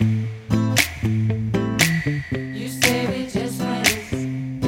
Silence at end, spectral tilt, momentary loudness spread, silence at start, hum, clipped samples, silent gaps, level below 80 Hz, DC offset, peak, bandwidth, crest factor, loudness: 0 s; -4.5 dB/octave; 8 LU; 0 s; none; under 0.1%; none; -44 dBFS; under 0.1%; 0 dBFS; 17 kHz; 22 dB; -21 LUFS